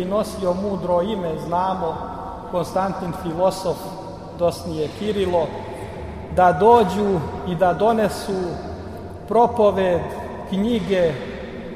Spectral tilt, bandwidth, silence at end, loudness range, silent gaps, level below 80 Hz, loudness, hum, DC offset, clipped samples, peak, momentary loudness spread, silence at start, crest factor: -6.5 dB/octave; 15.5 kHz; 0 s; 5 LU; none; -42 dBFS; -21 LUFS; none; under 0.1%; under 0.1%; -2 dBFS; 16 LU; 0 s; 20 dB